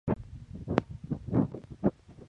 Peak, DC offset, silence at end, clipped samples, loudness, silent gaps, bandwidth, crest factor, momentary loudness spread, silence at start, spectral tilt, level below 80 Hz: -6 dBFS; under 0.1%; 0 s; under 0.1%; -33 LUFS; none; 8 kHz; 28 dB; 10 LU; 0.05 s; -9.5 dB/octave; -50 dBFS